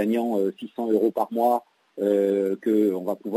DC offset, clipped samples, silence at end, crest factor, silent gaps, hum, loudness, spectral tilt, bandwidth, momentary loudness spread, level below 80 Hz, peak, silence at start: under 0.1%; under 0.1%; 0 s; 14 dB; none; none; -24 LUFS; -7.5 dB/octave; 16 kHz; 7 LU; -80 dBFS; -10 dBFS; 0 s